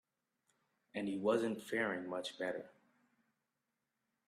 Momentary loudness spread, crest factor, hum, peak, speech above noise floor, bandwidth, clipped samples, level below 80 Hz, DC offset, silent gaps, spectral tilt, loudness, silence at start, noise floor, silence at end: 13 LU; 22 dB; none; -20 dBFS; 50 dB; 14 kHz; under 0.1%; -86 dBFS; under 0.1%; none; -5 dB/octave; -39 LUFS; 0.95 s; -88 dBFS; 1.55 s